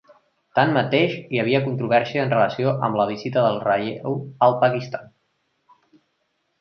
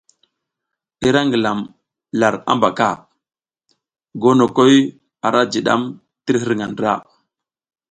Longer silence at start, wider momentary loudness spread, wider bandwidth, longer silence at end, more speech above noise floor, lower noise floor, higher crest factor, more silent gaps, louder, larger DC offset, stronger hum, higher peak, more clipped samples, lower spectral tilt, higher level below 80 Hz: second, 0.55 s vs 1 s; second, 8 LU vs 13 LU; second, 6.6 kHz vs 9.2 kHz; first, 1.55 s vs 0.9 s; second, 51 dB vs 66 dB; second, -71 dBFS vs -81 dBFS; about the same, 20 dB vs 18 dB; neither; second, -21 LUFS vs -17 LUFS; neither; neither; about the same, -2 dBFS vs 0 dBFS; neither; first, -7.5 dB/octave vs -5.5 dB/octave; second, -64 dBFS vs -58 dBFS